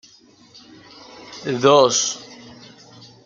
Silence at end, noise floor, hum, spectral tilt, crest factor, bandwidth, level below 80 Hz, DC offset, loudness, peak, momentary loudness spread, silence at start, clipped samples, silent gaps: 0.9 s; -51 dBFS; none; -3 dB/octave; 20 dB; 9.4 kHz; -66 dBFS; under 0.1%; -17 LUFS; -2 dBFS; 27 LU; 1.2 s; under 0.1%; none